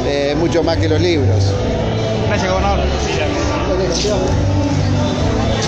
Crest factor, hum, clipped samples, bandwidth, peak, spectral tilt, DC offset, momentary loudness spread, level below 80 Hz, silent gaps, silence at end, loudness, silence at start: 12 dB; none; under 0.1%; 8.2 kHz; -4 dBFS; -6 dB/octave; under 0.1%; 3 LU; -24 dBFS; none; 0 s; -16 LUFS; 0 s